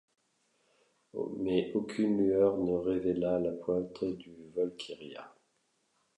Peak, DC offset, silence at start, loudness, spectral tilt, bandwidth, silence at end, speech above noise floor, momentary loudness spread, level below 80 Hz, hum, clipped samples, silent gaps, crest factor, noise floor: -16 dBFS; under 0.1%; 1.15 s; -32 LUFS; -7.5 dB/octave; 10.5 kHz; 0.9 s; 44 dB; 16 LU; -64 dBFS; none; under 0.1%; none; 18 dB; -76 dBFS